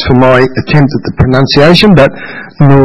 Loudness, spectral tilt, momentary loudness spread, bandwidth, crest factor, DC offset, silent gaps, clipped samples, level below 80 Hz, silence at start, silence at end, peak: -6 LUFS; -7.5 dB/octave; 8 LU; 12 kHz; 6 dB; under 0.1%; none; 5%; -28 dBFS; 0 s; 0 s; 0 dBFS